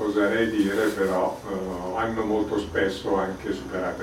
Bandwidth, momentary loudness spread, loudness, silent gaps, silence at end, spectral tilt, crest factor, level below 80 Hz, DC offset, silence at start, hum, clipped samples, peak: 16.5 kHz; 7 LU; -26 LUFS; none; 0 s; -5.5 dB/octave; 14 dB; -50 dBFS; under 0.1%; 0 s; none; under 0.1%; -10 dBFS